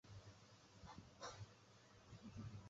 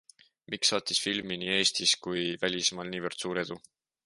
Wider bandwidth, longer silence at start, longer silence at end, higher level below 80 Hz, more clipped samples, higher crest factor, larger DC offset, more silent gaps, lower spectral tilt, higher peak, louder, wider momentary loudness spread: second, 7.6 kHz vs 11.5 kHz; second, 0.05 s vs 0.5 s; second, 0 s vs 0.45 s; about the same, -72 dBFS vs -68 dBFS; neither; about the same, 20 dB vs 20 dB; neither; neither; first, -5 dB/octave vs -2 dB/octave; second, -40 dBFS vs -12 dBFS; second, -60 LUFS vs -28 LUFS; about the same, 11 LU vs 10 LU